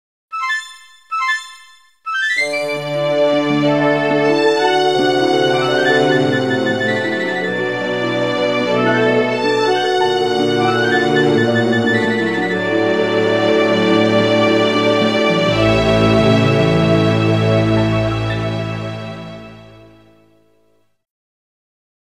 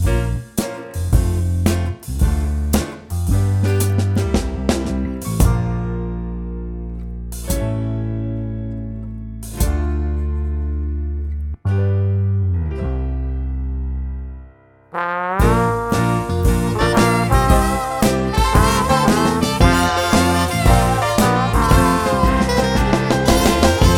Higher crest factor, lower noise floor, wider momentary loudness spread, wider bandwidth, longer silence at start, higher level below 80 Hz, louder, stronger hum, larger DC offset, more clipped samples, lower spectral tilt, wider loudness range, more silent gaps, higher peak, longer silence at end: about the same, 14 dB vs 16 dB; first, -60 dBFS vs -45 dBFS; second, 7 LU vs 12 LU; second, 13 kHz vs 18 kHz; first, 0.3 s vs 0 s; second, -42 dBFS vs -22 dBFS; first, -15 LUFS vs -18 LUFS; neither; first, 0.4% vs under 0.1%; neither; about the same, -6 dB/octave vs -5.5 dB/octave; about the same, 6 LU vs 8 LU; neither; about the same, 0 dBFS vs 0 dBFS; first, 2.45 s vs 0 s